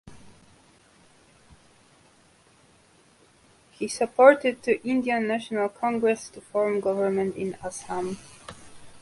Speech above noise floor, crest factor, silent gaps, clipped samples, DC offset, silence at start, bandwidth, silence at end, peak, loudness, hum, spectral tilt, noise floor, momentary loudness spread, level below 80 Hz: 34 dB; 26 dB; none; under 0.1%; under 0.1%; 0.05 s; 11.5 kHz; 0.05 s; -2 dBFS; -25 LUFS; none; -5 dB/octave; -59 dBFS; 18 LU; -64 dBFS